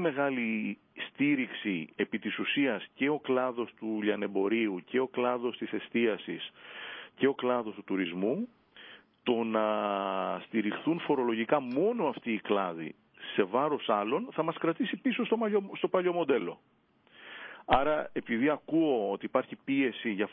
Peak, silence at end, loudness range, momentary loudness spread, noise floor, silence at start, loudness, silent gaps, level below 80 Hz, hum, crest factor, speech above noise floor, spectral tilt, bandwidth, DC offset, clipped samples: -10 dBFS; 0 s; 2 LU; 11 LU; -55 dBFS; 0 s; -31 LUFS; none; -66 dBFS; none; 22 dB; 25 dB; -9.5 dB/octave; 5.2 kHz; under 0.1%; under 0.1%